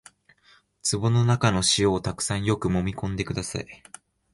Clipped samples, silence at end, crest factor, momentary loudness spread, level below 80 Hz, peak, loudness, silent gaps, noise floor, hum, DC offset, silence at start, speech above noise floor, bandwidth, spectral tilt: under 0.1%; 0.6 s; 18 dB; 12 LU; -46 dBFS; -8 dBFS; -24 LUFS; none; -60 dBFS; none; under 0.1%; 0.85 s; 36 dB; 11.5 kHz; -4.5 dB/octave